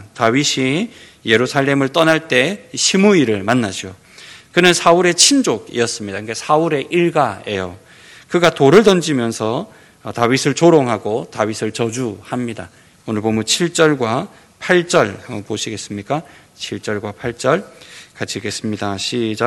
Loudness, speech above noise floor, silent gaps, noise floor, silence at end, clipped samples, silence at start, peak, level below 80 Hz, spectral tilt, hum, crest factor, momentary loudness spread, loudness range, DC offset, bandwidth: -16 LUFS; 24 dB; none; -40 dBFS; 0 s; 0.2%; 0 s; 0 dBFS; -56 dBFS; -4 dB/octave; none; 16 dB; 15 LU; 6 LU; under 0.1%; 17.5 kHz